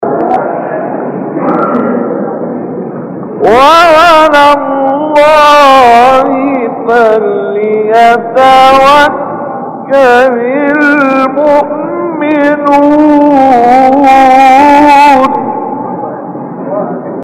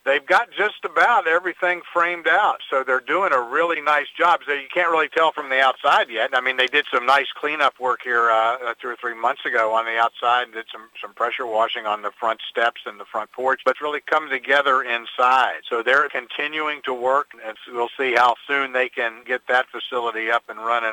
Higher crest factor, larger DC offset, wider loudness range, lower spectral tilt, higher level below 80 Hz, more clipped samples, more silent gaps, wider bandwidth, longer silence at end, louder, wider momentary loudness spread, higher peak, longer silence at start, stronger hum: second, 6 dB vs 18 dB; neither; about the same, 4 LU vs 4 LU; first, -5 dB/octave vs -2.5 dB/octave; first, -40 dBFS vs -74 dBFS; first, 2% vs under 0.1%; neither; second, 16 kHz vs 18 kHz; about the same, 0 s vs 0 s; first, -6 LUFS vs -20 LUFS; first, 14 LU vs 9 LU; first, 0 dBFS vs -4 dBFS; about the same, 0 s vs 0.05 s; neither